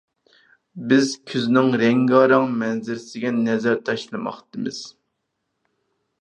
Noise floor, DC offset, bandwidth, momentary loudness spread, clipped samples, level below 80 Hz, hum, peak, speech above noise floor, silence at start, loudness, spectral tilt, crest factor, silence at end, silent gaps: -76 dBFS; under 0.1%; 9.4 kHz; 14 LU; under 0.1%; -72 dBFS; none; -2 dBFS; 56 dB; 0.75 s; -20 LUFS; -5.5 dB/octave; 20 dB; 1.3 s; none